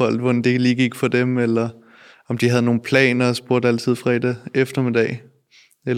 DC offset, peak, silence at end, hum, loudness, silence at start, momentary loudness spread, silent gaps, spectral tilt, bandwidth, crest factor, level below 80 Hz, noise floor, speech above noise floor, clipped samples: under 0.1%; -2 dBFS; 0 s; none; -19 LUFS; 0 s; 6 LU; none; -6.5 dB/octave; 14.5 kHz; 18 dB; -66 dBFS; -54 dBFS; 36 dB; under 0.1%